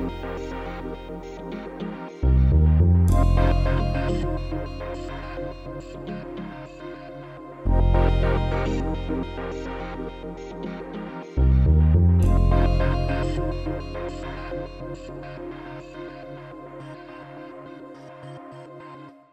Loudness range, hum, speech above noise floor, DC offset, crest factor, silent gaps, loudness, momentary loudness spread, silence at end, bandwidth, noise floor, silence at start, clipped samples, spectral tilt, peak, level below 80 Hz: 16 LU; none; 16 dB; under 0.1%; 16 dB; none; -24 LUFS; 21 LU; 0.2 s; 8.2 kHz; -43 dBFS; 0 s; under 0.1%; -8.5 dB/octave; -8 dBFS; -26 dBFS